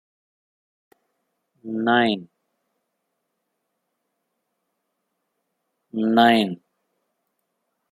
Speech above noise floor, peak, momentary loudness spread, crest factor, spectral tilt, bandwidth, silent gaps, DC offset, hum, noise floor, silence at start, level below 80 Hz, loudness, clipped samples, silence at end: 58 dB; -2 dBFS; 16 LU; 24 dB; -6 dB/octave; 15.5 kHz; none; under 0.1%; none; -77 dBFS; 1.65 s; -74 dBFS; -20 LUFS; under 0.1%; 1.35 s